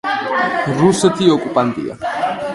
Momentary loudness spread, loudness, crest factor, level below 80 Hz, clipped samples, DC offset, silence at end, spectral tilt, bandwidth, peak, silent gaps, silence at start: 8 LU; -16 LUFS; 16 dB; -52 dBFS; under 0.1%; under 0.1%; 0 s; -5 dB/octave; 11.5 kHz; 0 dBFS; none; 0.05 s